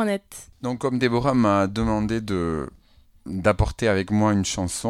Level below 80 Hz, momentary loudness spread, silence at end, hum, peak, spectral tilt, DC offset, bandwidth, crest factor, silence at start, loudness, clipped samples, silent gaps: -38 dBFS; 12 LU; 0 s; none; -4 dBFS; -5.5 dB/octave; under 0.1%; 15 kHz; 18 dB; 0 s; -23 LUFS; under 0.1%; none